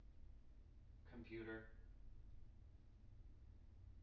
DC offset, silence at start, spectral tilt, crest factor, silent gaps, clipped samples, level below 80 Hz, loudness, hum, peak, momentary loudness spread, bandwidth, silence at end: under 0.1%; 0 s; -6 dB/octave; 18 dB; none; under 0.1%; -64 dBFS; -61 LUFS; none; -42 dBFS; 14 LU; 5.6 kHz; 0 s